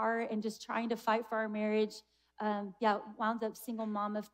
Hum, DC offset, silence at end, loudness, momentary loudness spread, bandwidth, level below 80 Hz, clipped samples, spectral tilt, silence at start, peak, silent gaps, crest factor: none; under 0.1%; 0.05 s; -36 LUFS; 6 LU; 16 kHz; -82 dBFS; under 0.1%; -5.5 dB/octave; 0 s; -18 dBFS; none; 18 dB